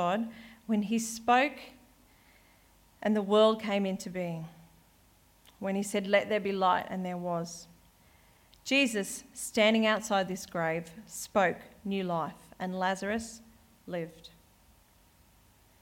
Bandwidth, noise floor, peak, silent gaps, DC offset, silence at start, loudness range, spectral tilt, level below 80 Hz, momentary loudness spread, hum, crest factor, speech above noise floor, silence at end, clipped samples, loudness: 17 kHz; -63 dBFS; -12 dBFS; none; under 0.1%; 0 s; 6 LU; -4.5 dB/octave; -66 dBFS; 16 LU; none; 20 dB; 33 dB; 1.55 s; under 0.1%; -30 LUFS